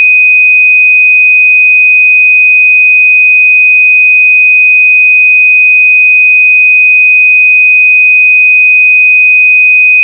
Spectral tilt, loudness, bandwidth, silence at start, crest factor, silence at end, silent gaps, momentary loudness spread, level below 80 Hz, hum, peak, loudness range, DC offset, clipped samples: 6.5 dB/octave; -1 LUFS; 2.8 kHz; 0 s; 4 dB; 0 s; none; 0 LU; under -90 dBFS; none; 0 dBFS; 0 LU; under 0.1%; under 0.1%